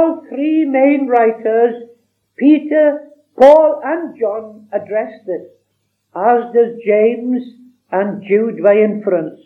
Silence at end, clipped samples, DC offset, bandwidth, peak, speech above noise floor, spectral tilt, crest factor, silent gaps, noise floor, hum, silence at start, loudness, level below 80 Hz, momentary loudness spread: 0.1 s; 0.3%; under 0.1%; 6.2 kHz; 0 dBFS; 54 dB; -8 dB/octave; 14 dB; none; -67 dBFS; none; 0 s; -14 LUFS; -66 dBFS; 14 LU